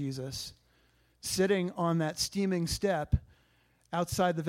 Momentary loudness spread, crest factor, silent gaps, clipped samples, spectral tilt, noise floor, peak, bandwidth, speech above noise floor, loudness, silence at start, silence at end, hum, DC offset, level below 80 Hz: 10 LU; 20 dB; none; under 0.1%; -5 dB/octave; -68 dBFS; -12 dBFS; 16.5 kHz; 38 dB; -32 LUFS; 0 s; 0 s; none; under 0.1%; -46 dBFS